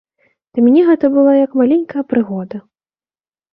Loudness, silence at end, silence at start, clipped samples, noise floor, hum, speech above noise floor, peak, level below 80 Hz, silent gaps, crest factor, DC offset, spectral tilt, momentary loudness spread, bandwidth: -13 LUFS; 0.9 s; 0.55 s; under 0.1%; under -90 dBFS; none; over 78 dB; -2 dBFS; -60 dBFS; none; 12 dB; under 0.1%; -11 dB/octave; 14 LU; 4.4 kHz